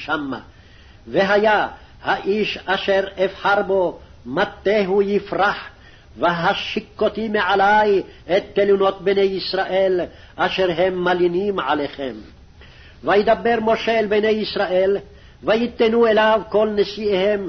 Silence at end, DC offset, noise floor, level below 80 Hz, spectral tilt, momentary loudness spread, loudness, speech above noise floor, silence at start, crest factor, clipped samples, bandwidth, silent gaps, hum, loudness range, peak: 0 s; under 0.1%; -45 dBFS; -48 dBFS; -6 dB/octave; 10 LU; -19 LUFS; 27 dB; 0 s; 14 dB; under 0.1%; 6.4 kHz; none; none; 3 LU; -6 dBFS